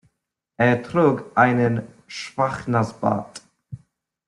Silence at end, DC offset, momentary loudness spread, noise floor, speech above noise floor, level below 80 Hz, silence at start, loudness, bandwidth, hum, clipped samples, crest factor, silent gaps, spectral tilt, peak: 0.5 s; under 0.1%; 24 LU; -79 dBFS; 58 dB; -58 dBFS; 0.6 s; -21 LUFS; 11 kHz; none; under 0.1%; 20 dB; none; -7 dB/octave; -4 dBFS